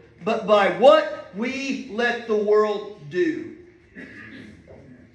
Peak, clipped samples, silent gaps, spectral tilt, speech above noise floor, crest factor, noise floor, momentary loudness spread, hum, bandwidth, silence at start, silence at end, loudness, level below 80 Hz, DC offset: -2 dBFS; under 0.1%; none; -5 dB/octave; 26 dB; 20 dB; -46 dBFS; 24 LU; none; 9 kHz; 0.2 s; 0.35 s; -21 LUFS; -62 dBFS; under 0.1%